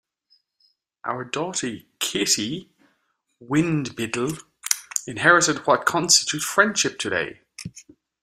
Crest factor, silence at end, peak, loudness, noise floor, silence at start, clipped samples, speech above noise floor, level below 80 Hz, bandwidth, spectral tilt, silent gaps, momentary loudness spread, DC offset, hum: 24 dB; 0.4 s; 0 dBFS; -21 LUFS; -71 dBFS; 1.05 s; under 0.1%; 48 dB; -62 dBFS; 15.5 kHz; -2.5 dB/octave; none; 17 LU; under 0.1%; none